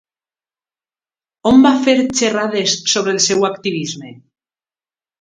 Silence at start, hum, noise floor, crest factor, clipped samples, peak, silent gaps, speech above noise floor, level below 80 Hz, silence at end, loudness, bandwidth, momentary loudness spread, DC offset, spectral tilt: 1.45 s; none; under -90 dBFS; 18 dB; under 0.1%; 0 dBFS; none; over 76 dB; -52 dBFS; 1.05 s; -14 LUFS; 9.6 kHz; 11 LU; under 0.1%; -3 dB/octave